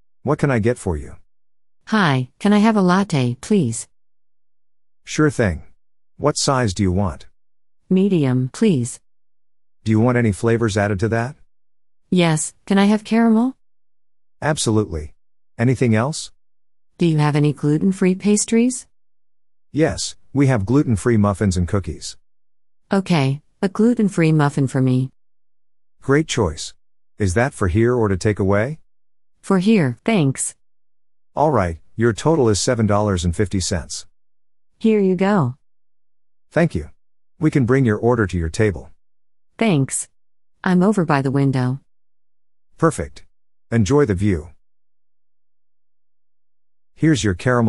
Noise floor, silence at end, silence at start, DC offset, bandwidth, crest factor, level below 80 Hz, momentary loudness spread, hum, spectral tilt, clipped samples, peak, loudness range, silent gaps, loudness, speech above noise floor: under -90 dBFS; 0 s; 0.25 s; under 0.1%; 11.5 kHz; 18 dB; -42 dBFS; 10 LU; none; -6 dB/octave; under 0.1%; -2 dBFS; 3 LU; none; -19 LUFS; over 73 dB